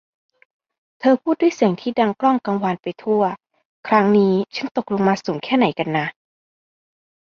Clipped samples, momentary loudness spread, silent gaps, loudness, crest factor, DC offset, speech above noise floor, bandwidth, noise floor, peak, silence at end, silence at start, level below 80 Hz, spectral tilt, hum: under 0.1%; 8 LU; 3.65-3.83 s, 4.71-4.75 s; -19 LUFS; 18 dB; under 0.1%; over 72 dB; 7 kHz; under -90 dBFS; -4 dBFS; 1.25 s; 1 s; -64 dBFS; -7 dB/octave; none